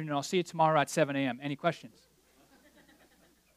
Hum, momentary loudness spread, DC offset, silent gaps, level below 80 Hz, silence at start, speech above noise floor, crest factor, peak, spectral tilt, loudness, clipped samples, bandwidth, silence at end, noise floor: none; 7 LU; under 0.1%; none; -78 dBFS; 0 s; 35 dB; 20 dB; -12 dBFS; -5 dB/octave; -30 LUFS; under 0.1%; 15.5 kHz; 1.7 s; -65 dBFS